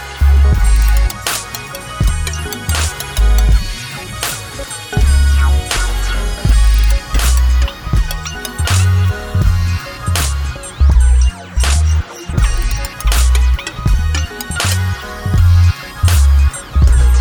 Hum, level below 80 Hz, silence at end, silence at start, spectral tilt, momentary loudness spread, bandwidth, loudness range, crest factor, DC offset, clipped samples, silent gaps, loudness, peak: none; -14 dBFS; 0 s; 0 s; -4 dB/octave; 9 LU; 20 kHz; 2 LU; 12 dB; under 0.1%; under 0.1%; none; -15 LUFS; 0 dBFS